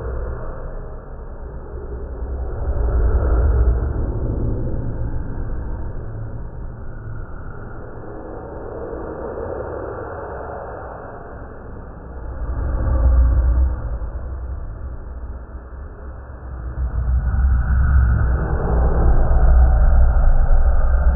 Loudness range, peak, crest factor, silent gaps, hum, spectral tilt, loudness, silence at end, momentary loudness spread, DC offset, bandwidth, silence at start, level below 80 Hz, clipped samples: 13 LU; -2 dBFS; 16 dB; none; none; -12 dB/octave; -22 LUFS; 0 s; 18 LU; under 0.1%; 1.9 kHz; 0 s; -20 dBFS; under 0.1%